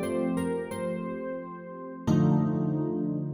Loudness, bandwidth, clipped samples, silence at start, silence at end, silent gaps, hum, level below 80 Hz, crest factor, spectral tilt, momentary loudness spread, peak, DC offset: -29 LUFS; 16 kHz; under 0.1%; 0 s; 0 s; none; none; -60 dBFS; 16 dB; -8.5 dB/octave; 14 LU; -12 dBFS; under 0.1%